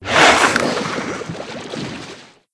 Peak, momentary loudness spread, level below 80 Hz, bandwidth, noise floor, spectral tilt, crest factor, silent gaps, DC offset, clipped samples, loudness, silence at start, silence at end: 0 dBFS; 19 LU; -48 dBFS; 11 kHz; -38 dBFS; -2.5 dB/octave; 18 dB; none; under 0.1%; under 0.1%; -15 LUFS; 0 s; 0.3 s